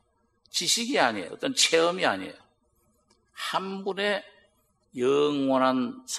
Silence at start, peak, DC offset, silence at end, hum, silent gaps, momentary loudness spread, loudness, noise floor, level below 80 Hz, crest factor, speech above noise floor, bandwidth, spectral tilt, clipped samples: 0.55 s; -6 dBFS; under 0.1%; 0 s; none; none; 11 LU; -26 LUFS; -69 dBFS; -74 dBFS; 22 dB; 43 dB; 13 kHz; -2.5 dB/octave; under 0.1%